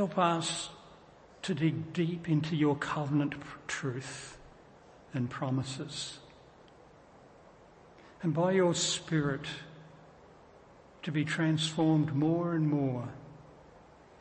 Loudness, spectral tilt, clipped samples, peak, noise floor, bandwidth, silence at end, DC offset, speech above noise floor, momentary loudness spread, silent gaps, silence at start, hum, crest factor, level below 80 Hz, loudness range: -32 LUFS; -5.5 dB/octave; under 0.1%; -14 dBFS; -57 dBFS; 8.8 kHz; 0.4 s; under 0.1%; 26 dB; 15 LU; none; 0 s; none; 20 dB; -66 dBFS; 8 LU